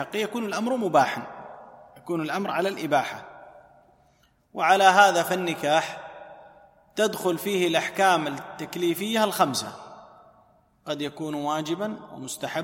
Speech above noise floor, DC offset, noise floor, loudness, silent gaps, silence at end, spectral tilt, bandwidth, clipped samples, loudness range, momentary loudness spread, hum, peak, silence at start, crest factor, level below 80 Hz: 39 dB; under 0.1%; -63 dBFS; -24 LUFS; none; 0 s; -3.5 dB/octave; 16.5 kHz; under 0.1%; 7 LU; 21 LU; none; -4 dBFS; 0 s; 22 dB; -70 dBFS